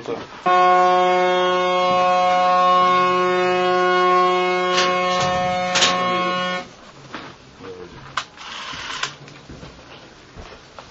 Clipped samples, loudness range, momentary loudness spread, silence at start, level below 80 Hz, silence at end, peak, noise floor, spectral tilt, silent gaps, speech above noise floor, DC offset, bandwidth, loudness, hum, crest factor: under 0.1%; 15 LU; 21 LU; 0 s; -52 dBFS; 0.05 s; -2 dBFS; -43 dBFS; -3.5 dB/octave; none; 26 dB; under 0.1%; 8.2 kHz; -18 LUFS; none; 18 dB